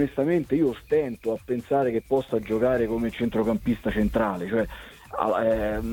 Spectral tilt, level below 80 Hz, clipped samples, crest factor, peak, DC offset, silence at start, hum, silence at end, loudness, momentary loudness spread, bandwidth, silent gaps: -7.5 dB/octave; -44 dBFS; under 0.1%; 16 dB; -8 dBFS; under 0.1%; 0 s; none; 0 s; -25 LUFS; 6 LU; 18.5 kHz; none